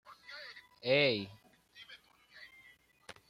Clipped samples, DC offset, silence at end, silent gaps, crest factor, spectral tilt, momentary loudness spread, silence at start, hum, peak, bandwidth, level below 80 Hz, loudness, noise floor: under 0.1%; under 0.1%; 0.15 s; none; 22 dB; -5.5 dB/octave; 26 LU; 0.1 s; none; -16 dBFS; 14 kHz; -78 dBFS; -31 LUFS; -64 dBFS